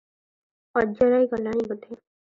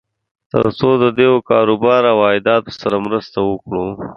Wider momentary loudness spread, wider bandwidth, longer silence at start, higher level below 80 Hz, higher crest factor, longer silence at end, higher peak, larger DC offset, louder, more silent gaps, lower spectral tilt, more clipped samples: first, 19 LU vs 9 LU; about the same, 7 kHz vs 6.6 kHz; first, 0.75 s vs 0.55 s; second, -58 dBFS vs -48 dBFS; about the same, 18 dB vs 14 dB; first, 0.4 s vs 0.05 s; second, -8 dBFS vs 0 dBFS; neither; second, -24 LUFS vs -15 LUFS; neither; about the same, -8 dB/octave vs -7.5 dB/octave; neither